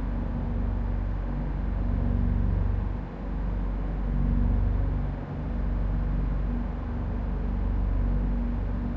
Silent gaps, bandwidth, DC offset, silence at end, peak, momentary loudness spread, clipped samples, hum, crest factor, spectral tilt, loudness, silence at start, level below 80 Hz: none; 3.7 kHz; under 0.1%; 0 s; -14 dBFS; 5 LU; under 0.1%; none; 12 dB; -10.5 dB/octave; -30 LUFS; 0 s; -28 dBFS